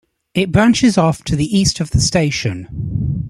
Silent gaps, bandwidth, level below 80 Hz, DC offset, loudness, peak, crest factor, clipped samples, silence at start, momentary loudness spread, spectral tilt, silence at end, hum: none; 13.5 kHz; -34 dBFS; under 0.1%; -16 LUFS; -2 dBFS; 14 dB; under 0.1%; 0.35 s; 11 LU; -5 dB/octave; 0 s; none